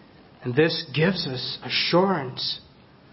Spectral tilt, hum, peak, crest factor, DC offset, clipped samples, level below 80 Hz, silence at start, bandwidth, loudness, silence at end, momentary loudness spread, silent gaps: -8.5 dB/octave; none; -6 dBFS; 18 dB; under 0.1%; under 0.1%; -60 dBFS; 0.4 s; 5.8 kHz; -24 LUFS; 0.5 s; 9 LU; none